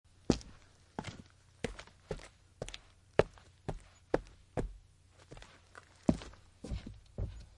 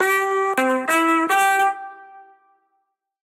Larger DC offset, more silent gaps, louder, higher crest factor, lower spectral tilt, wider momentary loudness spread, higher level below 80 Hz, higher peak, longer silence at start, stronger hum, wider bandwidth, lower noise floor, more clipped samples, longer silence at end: neither; neither; second, -40 LUFS vs -18 LUFS; first, 32 dB vs 14 dB; first, -6 dB/octave vs -1.5 dB/octave; first, 21 LU vs 8 LU; first, -50 dBFS vs -80 dBFS; about the same, -8 dBFS vs -8 dBFS; first, 0.3 s vs 0 s; neither; second, 11.5 kHz vs 17 kHz; second, -62 dBFS vs -72 dBFS; neither; second, 0.15 s vs 1.05 s